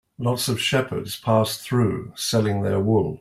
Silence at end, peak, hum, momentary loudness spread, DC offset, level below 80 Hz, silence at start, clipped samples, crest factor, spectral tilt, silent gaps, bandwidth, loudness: 0.05 s; -6 dBFS; none; 5 LU; under 0.1%; -54 dBFS; 0.2 s; under 0.1%; 16 dB; -5 dB/octave; none; 16 kHz; -23 LUFS